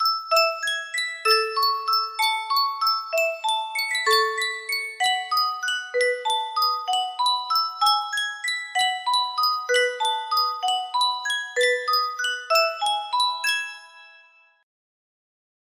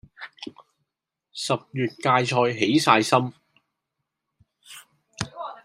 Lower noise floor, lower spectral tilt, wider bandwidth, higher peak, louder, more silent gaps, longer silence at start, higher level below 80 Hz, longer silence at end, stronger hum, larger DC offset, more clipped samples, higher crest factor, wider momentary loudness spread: second, -55 dBFS vs -84 dBFS; second, 3 dB/octave vs -4.5 dB/octave; about the same, 16 kHz vs 16 kHz; second, -6 dBFS vs -2 dBFS; about the same, -22 LUFS vs -23 LUFS; neither; second, 0 s vs 0.2 s; second, -78 dBFS vs -66 dBFS; first, 1.55 s vs 0.1 s; neither; neither; neither; second, 18 dB vs 24 dB; second, 5 LU vs 25 LU